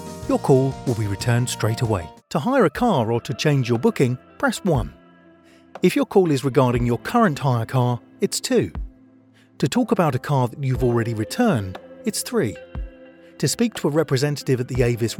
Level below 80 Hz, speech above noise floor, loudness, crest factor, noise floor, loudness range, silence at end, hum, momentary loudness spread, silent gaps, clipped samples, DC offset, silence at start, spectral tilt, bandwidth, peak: -42 dBFS; 33 dB; -21 LUFS; 18 dB; -53 dBFS; 3 LU; 0 s; none; 8 LU; none; under 0.1%; under 0.1%; 0 s; -6 dB/octave; 18 kHz; -4 dBFS